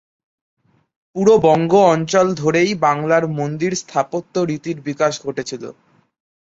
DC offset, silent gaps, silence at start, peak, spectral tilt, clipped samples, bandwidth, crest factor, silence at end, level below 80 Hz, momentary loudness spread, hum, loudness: under 0.1%; none; 1.15 s; -2 dBFS; -5.5 dB/octave; under 0.1%; 8 kHz; 16 dB; 0.75 s; -58 dBFS; 13 LU; none; -17 LUFS